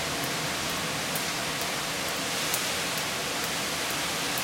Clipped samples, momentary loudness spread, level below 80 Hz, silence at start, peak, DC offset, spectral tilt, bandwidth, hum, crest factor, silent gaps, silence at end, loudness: under 0.1%; 2 LU; -58 dBFS; 0 s; -6 dBFS; under 0.1%; -1.5 dB/octave; 17 kHz; none; 24 dB; none; 0 s; -28 LUFS